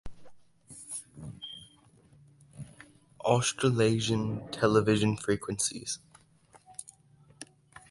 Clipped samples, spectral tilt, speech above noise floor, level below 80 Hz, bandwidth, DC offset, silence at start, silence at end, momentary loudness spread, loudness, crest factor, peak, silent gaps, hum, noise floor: under 0.1%; -4.5 dB/octave; 33 dB; -58 dBFS; 11.5 kHz; under 0.1%; 0.05 s; 0.45 s; 23 LU; -29 LUFS; 24 dB; -10 dBFS; none; none; -61 dBFS